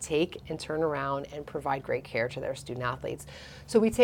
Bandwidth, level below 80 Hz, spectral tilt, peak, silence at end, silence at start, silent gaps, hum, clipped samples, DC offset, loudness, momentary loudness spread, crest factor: 17 kHz; -54 dBFS; -5 dB/octave; -8 dBFS; 0 s; 0 s; none; none; under 0.1%; under 0.1%; -32 LUFS; 10 LU; 22 dB